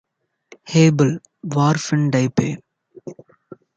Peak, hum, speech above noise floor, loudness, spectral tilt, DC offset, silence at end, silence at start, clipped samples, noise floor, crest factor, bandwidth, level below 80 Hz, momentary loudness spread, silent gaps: -2 dBFS; none; 34 dB; -18 LUFS; -6.5 dB/octave; under 0.1%; 0.25 s; 0.65 s; under 0.1%; -50 dBFS; 18 dB; 7.8 kHz; -58 dBFS; 23 LU; none